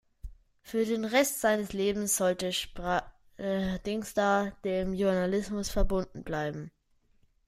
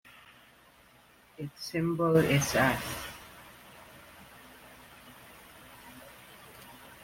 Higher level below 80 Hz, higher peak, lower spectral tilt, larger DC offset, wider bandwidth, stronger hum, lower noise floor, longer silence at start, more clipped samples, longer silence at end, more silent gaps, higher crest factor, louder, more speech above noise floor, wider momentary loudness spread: first, -42 dBFS vs -60 dBFS; about the same, -10 dBFS vs -12 dBFS; about the same, -4 dB/octave vs -5 dB/octave; neither; about the same, 16 kHz vs 16.5 kHz; neither; first, -67 dBFS vs -60 dBFS; second, 0.25 s vs 1.4 s; neither; first, 0.8 s vs 0 s; neither; about the same, 20 dB vs 22 dB; about the same, -30 LUFS vs -29 LUFS; first, 37 dB vs 32 dB; second, 8 LU vs 26 LU